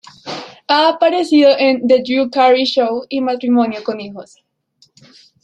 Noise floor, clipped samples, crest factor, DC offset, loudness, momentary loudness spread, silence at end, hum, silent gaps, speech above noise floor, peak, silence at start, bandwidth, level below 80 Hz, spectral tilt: -56 dBFS; under 0.1%; 14 dB; under 0.1%; -14 LUFS; 17 LU; 1.2 s; none; none; 42 dB; -2 dBFS; 0.25 s; 10 kHz; -64 dBFS; -4.5 dB/octave